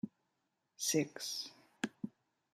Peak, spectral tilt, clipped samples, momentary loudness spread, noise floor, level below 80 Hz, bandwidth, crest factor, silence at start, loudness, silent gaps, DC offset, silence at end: -20 dBFS; -3 dB/octave; under 0.1%; 15 LU; -84 dBFS; -86 dBFS; 15 kHz; 22 dB; 0.05 s; -40 LUFS; none; under 0.1%; 0.45 s